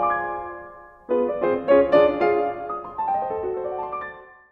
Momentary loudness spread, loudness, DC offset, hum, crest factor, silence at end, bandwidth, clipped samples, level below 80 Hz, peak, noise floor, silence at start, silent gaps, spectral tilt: 16 LU; -23 LUFS; under 0.1%; none; 18 dB; 0.2 s; 5.4 kHz; under 0.1%; -54 dBFS; -4 dBFS; -43 dBFS; 0 s; none; -8 dB/octave